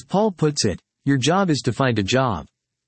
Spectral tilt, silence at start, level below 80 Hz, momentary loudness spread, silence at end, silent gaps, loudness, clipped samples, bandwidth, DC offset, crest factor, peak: -5 dB/octave; 0.1 s; -52 dBFS; 6 LU; 0.4 s; none; -21 LUFS; under 0.1%; 8.8 kHz; under 0.1%; 16 dB; -4 dBFS